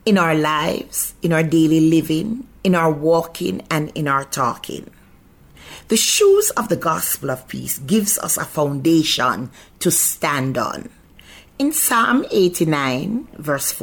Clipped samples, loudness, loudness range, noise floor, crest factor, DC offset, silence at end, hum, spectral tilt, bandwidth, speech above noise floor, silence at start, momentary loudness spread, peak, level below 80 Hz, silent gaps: under 0.1%; -18 LUFS; 3 LU; -48 dBFS; 14 dB; under 0.1%; 0 s; none; -4 dB/octave; 19 kHz; 30 dB; 0.05 s; 10 LU; -6 dBFS; -50 dBFS; none